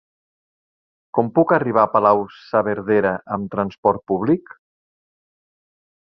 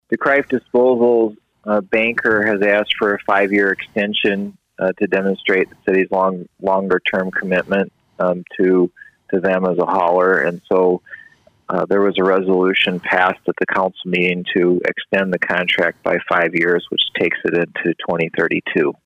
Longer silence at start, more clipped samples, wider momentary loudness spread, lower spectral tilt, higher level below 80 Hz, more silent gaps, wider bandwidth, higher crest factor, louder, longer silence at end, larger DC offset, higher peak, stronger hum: first, 1.15 s vs 0.1 s; neither; first, 8 LU vs 5 LU; first, -10 dB/octave vs -7 dB/octave; about the same, -58 dBFS vs -60 dBFS; first, 3.78-3.83 s vs none; second, 6 kHz vs 8.2 kHz; first, 20 dB vs 14 dB; about the same, -19 LUFS vs -17 LUFS; first, 1.7 s vs 0.15 s; neither; about the same, -2 dBFS vs -2 dBFS; neither